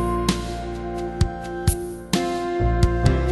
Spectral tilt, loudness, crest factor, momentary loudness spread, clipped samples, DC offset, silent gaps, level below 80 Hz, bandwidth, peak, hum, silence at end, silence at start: -6 dB/octave; -24 LUFS; 18 dB; 9 LU; under 0.1%; under 0.1%; none; -28 dBFS; 12.5 kHz; -4 dBFS; none; 0 s; 0 s